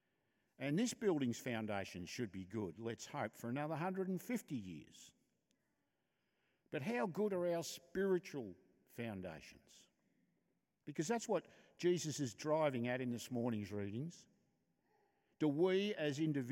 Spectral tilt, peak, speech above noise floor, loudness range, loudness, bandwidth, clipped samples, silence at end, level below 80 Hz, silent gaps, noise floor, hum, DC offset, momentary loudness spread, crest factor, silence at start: -5.5 dB/octave; -26 dBFS; 45 dB; 6 LU; -41 LUFS; 16.5 kHz; under 0.1%; 0 s; -82 dBFS; none; -86 dBFS; none; under 0.1%; 12 LU; 18 dB; 0.6 s